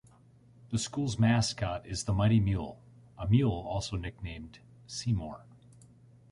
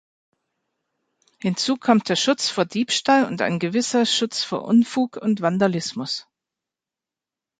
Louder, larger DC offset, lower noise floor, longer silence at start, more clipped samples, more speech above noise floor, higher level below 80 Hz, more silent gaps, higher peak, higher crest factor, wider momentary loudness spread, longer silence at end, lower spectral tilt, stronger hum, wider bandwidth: second, -31 LUFS vs -21 LUFS; neither; second, -59 dBFS vs -89 dBFS; second, 0.65 s vs 1.45 s; neither; second, 29 dB vs 68 dB; first, -48 dBFS vs -68 dBFS; neither; second, -12 dBFS vs -2 dBFS; about the same, 20 dB vs 20 dB; first, 16 LU vs 8 LU; second, 0.9 s vs 1.4 s; first, -6 dB/octave vs -4 dB/octave; neither; first, 11.5 kHz vs 9.4 kHz